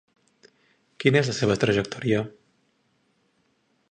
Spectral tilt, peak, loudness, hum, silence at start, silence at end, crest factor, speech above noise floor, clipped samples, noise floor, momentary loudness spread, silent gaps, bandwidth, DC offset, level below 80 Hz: -5.5 dB/octave; -4 dBFS; -23 LUFS; none; 1 s; 1.6 s; 22 dB; 46 dB; under 0.1%; -69 dBFS; 5 LU; none; 9.6 kHz; under 0.1%; -58 dBFS